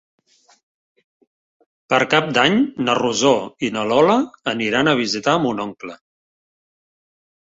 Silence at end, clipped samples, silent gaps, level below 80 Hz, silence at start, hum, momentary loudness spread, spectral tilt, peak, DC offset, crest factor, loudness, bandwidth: 1.65 s; under 0.1%; none; -60 dBFS; 1.9 s; none; 9 LU; -4 dB/octave; -2 dBFS; under 0.1%; 20 dB; -18 LUFS; 8 kHz